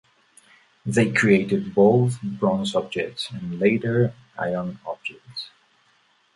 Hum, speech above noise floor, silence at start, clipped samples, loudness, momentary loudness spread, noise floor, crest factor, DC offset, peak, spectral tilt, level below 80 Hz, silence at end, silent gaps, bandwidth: none; 40 dB; 0.85 s; under 0.1%; -22 LUFS; 16 LU; -62 dBFS; 18 dB; under 0.1%; -4 dBFS; -6.5 dB/octave; -58 dBFS; 0.85 s; none; 11.5 kHz